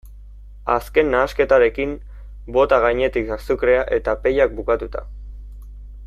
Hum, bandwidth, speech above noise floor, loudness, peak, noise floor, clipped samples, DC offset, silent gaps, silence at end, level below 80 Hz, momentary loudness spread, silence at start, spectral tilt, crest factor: 50 Hz at -35 dBFS; 14 kHz; 21 dB; -19 LUFS; -2 dBFS; -39 dBFS; under 0.1%; under 0.1%; none; 0 s; -34 dBFS; 22 LU; 0.05 s; -6.5 dB/octave; 18 dB